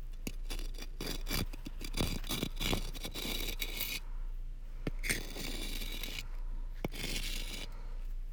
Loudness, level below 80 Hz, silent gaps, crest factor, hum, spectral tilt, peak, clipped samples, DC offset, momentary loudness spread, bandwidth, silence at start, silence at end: -40 LUFS; -40 dBFS; none; 22 dB; none; -3 dB/octave; -16 dBFS; under 0.1%; under 0.1%; 11 LU; over 20 kHz; 0 s; 0 s